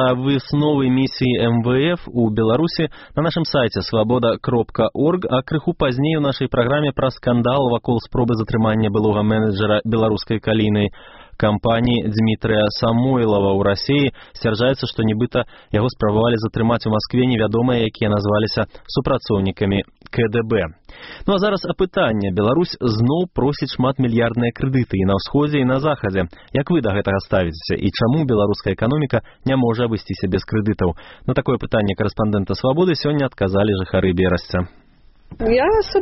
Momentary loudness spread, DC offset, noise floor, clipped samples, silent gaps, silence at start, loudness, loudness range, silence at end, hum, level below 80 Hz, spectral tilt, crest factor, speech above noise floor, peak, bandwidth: 5 LU; under 0.1%; -47 dBFS; under 0.1%; none; 0 s; -19 LUFS; 2 LU; 0 s; none; -40 dBFS; -6 dB/octave; 16 dB; 29 dB; -2 dBFS; 6 kHz